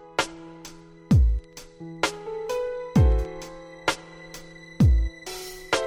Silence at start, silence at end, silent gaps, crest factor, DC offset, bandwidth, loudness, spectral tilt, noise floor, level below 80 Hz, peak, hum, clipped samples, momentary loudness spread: 0.05 s; 0 s; none; 16 dB; under 0.1%; 16 kHz; -25 LUFS; -6 dB/octave; -45 dBFS; -28 dBFS; -8 dBFS; none; under 0.1%; 21 LU